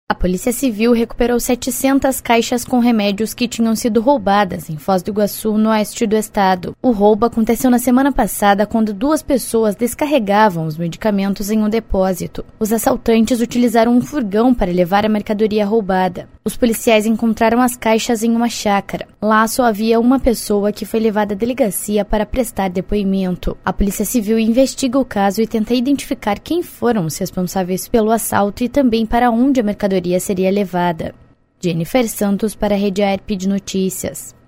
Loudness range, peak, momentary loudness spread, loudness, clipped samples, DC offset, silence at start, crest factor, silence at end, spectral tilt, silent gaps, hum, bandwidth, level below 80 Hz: 3 LU; 0 dBFS; 6 LU; -16 LUFS; under 0.1%; under 0.1%; 0.1 s; 16 dB; 0.2 s; -5 dB/octave; none; none; 16.5 kHz; -34 dBFS